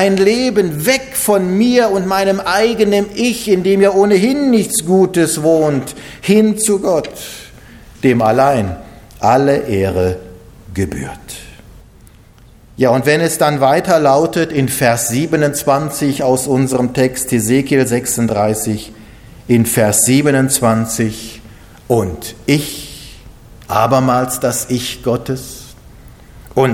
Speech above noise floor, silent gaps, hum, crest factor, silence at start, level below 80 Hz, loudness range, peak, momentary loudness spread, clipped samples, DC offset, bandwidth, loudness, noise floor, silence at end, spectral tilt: 29 dB; none; none; 14 dB; 0 s; -42 dBFS; 5 LU; 0 dBFS; 13 LU; under 0.1%; under 0.1%; 17 kHz; -14 LUFS; -42 dBFS; 0 s; -5 dB/octave